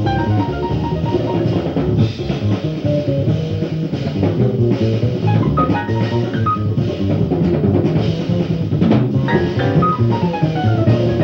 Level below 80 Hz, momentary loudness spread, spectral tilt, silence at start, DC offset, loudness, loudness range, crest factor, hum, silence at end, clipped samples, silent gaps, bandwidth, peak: -36 dBFS; 4 LU; -9 dB/octave; 0 s; under 0.1%; -17 LUFS; 2 LU; 14 dB; none; 0 s; under 0.1%; none; 6.6 kHz; -2 dBFS